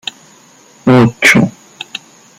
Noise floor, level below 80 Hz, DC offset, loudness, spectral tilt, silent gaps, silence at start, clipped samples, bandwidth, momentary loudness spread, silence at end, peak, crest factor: -43 dBFS; -48 dBFS; under 0.1%; -10 LUFS; -5 dB/octave; none; 0.85 s; under 0.1%; 16 kHz; 20 LU; 0.4 s; 0 dBFS; 14 dB